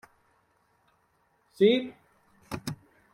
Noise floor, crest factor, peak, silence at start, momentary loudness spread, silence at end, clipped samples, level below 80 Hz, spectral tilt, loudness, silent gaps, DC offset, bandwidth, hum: -70 dBFS; 22 dB; -10 dBFS; 1.6 s; 19 LU; 0.4 s; under 0.1%; -66 dBFS; -6 dB/octave; -28 LUFS; none; under 0.1%; 16.5 kHz; none